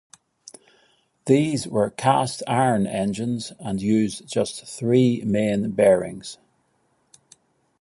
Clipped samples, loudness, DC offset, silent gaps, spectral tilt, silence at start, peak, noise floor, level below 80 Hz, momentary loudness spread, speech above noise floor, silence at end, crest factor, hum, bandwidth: under 0.1%; -22 LUFS; under 0.1%; none; -6 dB/octave; 1.25 s; -2 dBFS; -67 dBFS; -58 dBFS; 11 LU; 46 dB; 1.45 s; 20 dB; none; 11.5 kHz